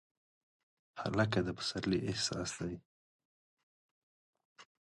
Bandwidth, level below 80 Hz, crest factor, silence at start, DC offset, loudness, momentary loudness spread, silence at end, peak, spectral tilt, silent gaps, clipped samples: 11.5 kHz; -62 dBFS; 24 dB; 0.95 s; under 0.1%; -36 LUFS; 11 LU; 0.3 s; -16 dBFS; -4.5 dB/octave; 2.85-3.19 s, 3.25-3.57 s, 3.63-4.33 s, 4.45-4.55 s; under 0.1%